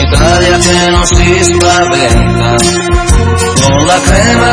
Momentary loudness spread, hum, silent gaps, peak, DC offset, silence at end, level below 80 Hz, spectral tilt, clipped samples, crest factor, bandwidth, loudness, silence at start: 2 LU; none; none; 0 dBFS; under 0.1%; 0 s; -14 dBFS; -4 dB/octave; 2%; 6 dB; 11 kHz; -7 LUFS; 0 s